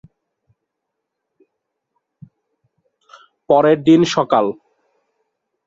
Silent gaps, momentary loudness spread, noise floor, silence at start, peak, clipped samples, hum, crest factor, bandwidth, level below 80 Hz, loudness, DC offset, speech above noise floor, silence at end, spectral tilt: none; 10 LU; -78 dBFS; 3.5 s; 0 dBFS; under 0.1%; none; 20 dB; 7.8 kHz; -62 dBFS; -14 LUFS; under 0.1%; 65 dB; 1.15 s; -6 dB/octave